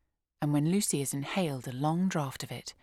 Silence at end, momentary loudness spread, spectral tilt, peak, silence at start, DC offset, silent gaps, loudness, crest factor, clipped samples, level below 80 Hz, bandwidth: 0.1 s; 9 LU; -5 dB/octave; -16 dBFS; 0.4 s; under 0.1%; none; -31 LUFS; 14 dB; under 0.1%; -66 dBFS; 16 kHz